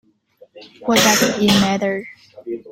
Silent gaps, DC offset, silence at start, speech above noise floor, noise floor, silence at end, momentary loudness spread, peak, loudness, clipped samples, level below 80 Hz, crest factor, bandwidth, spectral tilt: none; under 0.1%; 0.55 s; 35 dB; -51 dBFS; 0 s; 19 LU; 0 dBFS; -16 LUFS; under 0.1%; -52 dBFS; 18 dB; 16.5 kHz; -3 dB/octave